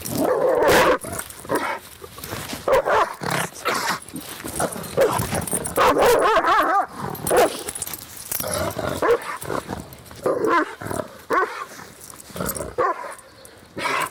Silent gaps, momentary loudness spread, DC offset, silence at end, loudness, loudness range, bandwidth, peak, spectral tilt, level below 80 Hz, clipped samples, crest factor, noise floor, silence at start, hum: none; 17 LU; under 0.1%; 0 s; -22 LUFS; 6 LU; 19 kHz; -8 dBFS; -3.5 dB/octave; -48 dBFS; under 0.1%; 14 dB; -46 dBFS; 0 s; none